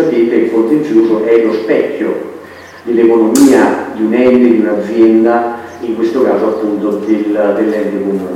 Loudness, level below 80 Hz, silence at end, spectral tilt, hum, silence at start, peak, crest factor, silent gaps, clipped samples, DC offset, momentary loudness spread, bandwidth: -11 LUFS; -54 dBFS; 0 s; -6 dB/octave; none; 0 s; 0 dBFS; 10 dB; none; 0.8%; under 0.1%; 9 LU; 15.5 kHz